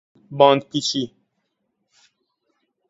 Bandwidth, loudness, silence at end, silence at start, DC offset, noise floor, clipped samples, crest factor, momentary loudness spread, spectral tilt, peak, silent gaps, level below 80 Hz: 8 kHz; -19 LUFS; 1.8 s; 0.3 s; under 0.1%; -74 dBFS; under 0.1%; 24 dB; 17 LU; -4.5 dB/octave; 0 dBFS; none; -68 dBFS